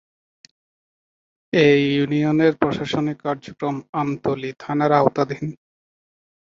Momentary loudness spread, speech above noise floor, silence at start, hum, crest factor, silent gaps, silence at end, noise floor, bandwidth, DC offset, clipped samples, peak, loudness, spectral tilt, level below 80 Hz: 11 LU; over 70 dB; 1.55 s; none; 20 dB; 3.89-3.93 s; 0.95 s; under -90 dBFS; 7.4 kHz; under 0.1%; under 0.1%; 0 dBFS; -20 LUFS; -7 dB/octave; -58 dBFS